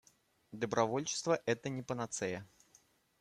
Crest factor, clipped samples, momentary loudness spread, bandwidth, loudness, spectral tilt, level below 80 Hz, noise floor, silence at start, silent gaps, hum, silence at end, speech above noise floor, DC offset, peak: 22 dB; under 0.1%; 9 LU; 14 kHz; -37 LUFS; -4 dB/octave; -74 dBFS; -70 dBFS; 0.5 s; none; none; 0.75 s; 33 dB; under 0.1%; -16 dBFS